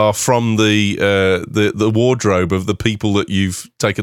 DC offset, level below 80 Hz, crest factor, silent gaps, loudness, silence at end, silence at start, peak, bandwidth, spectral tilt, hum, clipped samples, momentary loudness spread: under 0.1%; -46 dBFS; 14 dB; none; -16 LUFS; 0 s; 0 s; 0 dBFS; 17 kHz; -5 dB/octave; none; under 0.1%; 5 LU